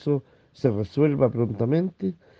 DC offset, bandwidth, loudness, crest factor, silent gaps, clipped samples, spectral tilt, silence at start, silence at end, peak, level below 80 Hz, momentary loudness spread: under 0.1%; 6.6 kHz; -24 LUFS; 18 dB; none; under 0.1%; -10 dB/octave; 0.05 s; 0.25 s; -6 dBFS; -58 dBFS; 7 LU